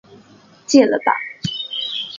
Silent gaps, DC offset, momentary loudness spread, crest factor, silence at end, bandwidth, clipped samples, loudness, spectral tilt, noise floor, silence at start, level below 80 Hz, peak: none; under 0.1%; 11 LU; 18 dB; 0 s; 7.4 kHz; under 0.1%; -18 LUFS; -4 dB/octave; -48 dBFS; 0.1 s; -60 dBFS; 0 dBFS